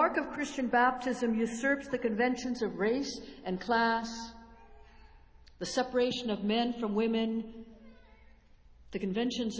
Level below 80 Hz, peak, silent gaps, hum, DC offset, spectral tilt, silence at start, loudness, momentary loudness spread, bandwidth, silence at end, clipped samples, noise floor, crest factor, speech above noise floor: -60 dBFS; -14 dBFS; none; none; under 0.1%; -4.5 dB/octave; 0 s; -32 LUFS; 12 LU; 8 kHz; 0 s; under 0.1%; -58 dBFS; 18 dB; 27 dB